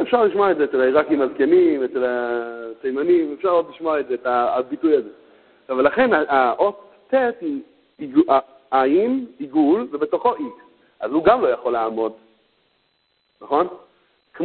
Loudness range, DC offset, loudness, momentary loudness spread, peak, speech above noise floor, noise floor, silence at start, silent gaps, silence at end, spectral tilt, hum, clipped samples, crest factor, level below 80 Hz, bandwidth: 3 LU; under 0.1%; -20 LUFS; 10 LU; -2 dBFS; 48 dB; -67 dBFS; 0 s; none; 0 s; -10 dB/octave; none; under 0.1%; 18 dB; -60 dBFS; 4.4 kHz